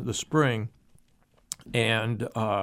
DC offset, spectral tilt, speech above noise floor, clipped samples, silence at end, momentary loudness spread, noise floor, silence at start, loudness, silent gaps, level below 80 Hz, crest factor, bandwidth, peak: under 0.1%; -5 dB/octave; 37 dB; under 0.1%; 0 s; 14 LU; -63 dBFS; 0 s; -27 LUFS; none; -60 dBFS; 22 dB; 15.5 kHz; -6 dBFS